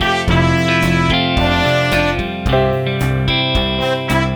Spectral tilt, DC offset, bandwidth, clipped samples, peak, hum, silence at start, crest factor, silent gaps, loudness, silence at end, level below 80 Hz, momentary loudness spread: -5.5 dB/octave; under 0.1%; over 20 kHz; under 0.1%; 0 dBFS; none; 0 s; 14 dB; none; -15 LUFS; 0 s; -26 dBFS; 4 LU